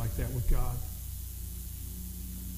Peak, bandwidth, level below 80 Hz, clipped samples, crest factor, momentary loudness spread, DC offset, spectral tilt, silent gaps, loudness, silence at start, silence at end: -16 dBFS; 16 kHz; -34 dBFS; under 0.1%; 16 dB; 7 LU; under 0.1%; -5.5 dB/octave; none; -37 LUFS; 0 s; 0 s